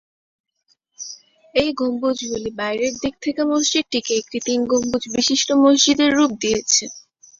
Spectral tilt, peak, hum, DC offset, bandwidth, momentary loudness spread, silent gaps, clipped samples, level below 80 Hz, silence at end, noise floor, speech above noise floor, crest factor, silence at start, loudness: -2 dB/octave; -2 dBFS; none; under 0.1%; 7.8 kHz; 10 LU; none; under 0.1%; -54 dBFS; 0.4 s; -66 dBFS; 47 dB; 18 dB; 1 s; -19 LUFS